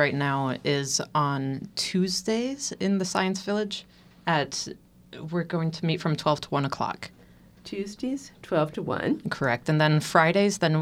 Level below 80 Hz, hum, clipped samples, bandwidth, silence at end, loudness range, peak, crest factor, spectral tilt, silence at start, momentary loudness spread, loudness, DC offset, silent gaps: -62 dBFS; none; under 0.1%; 15.5 kHz; 0 s; 4 LU; -4 dBFS; 22 dB; -5 dB/octave; 0 s; 13 LU; -26 LUFS; under 0.1%; none